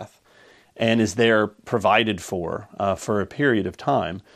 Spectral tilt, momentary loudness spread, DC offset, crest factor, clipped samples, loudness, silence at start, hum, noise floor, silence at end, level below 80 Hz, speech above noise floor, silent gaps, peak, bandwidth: -5 dB/octave; 9 LU; under 0.1%; 20 dB; under 0.1%; -22 LUFS; 0 s; none; -53 dBFS; 0.15 s; -56 dBFS; 32 dB; none; -4 dBFS; 14.5 kHz